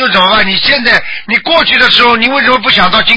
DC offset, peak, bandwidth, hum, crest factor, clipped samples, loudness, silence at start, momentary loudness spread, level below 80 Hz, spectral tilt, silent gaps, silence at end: under 0.1%; 0 dBFS; 8 kHz; none; 8 dB; 0.7%; -7 LUFS; 0 s; 4 LU; -38 dBFS; -4 dB/octave; none; 0 s